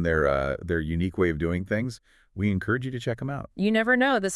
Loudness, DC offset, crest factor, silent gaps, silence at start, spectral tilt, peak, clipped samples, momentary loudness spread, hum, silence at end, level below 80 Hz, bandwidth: -26 LUFS; under 0.1%; 16 dB; none; 0 s; -6 dB/octave; -10 dBFS; under 0.1%; 11 LU; none; 0 s; -46 dBFS; 12 kHz